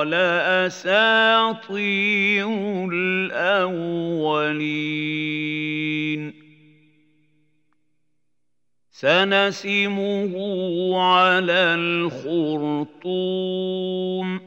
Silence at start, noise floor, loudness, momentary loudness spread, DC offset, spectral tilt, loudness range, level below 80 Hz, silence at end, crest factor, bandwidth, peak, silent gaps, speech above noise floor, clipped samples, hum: 0 s; -81 dBFS; -21 LUFS; 9 LU; under 0.1%; -5.5 dB/octave; 9 LU; -80 dBFS; 0 s; 18 dB; 8 kHz; -4 dBFS; none; 60 dB; under 0.1%; 60 Hz at -60 dBFS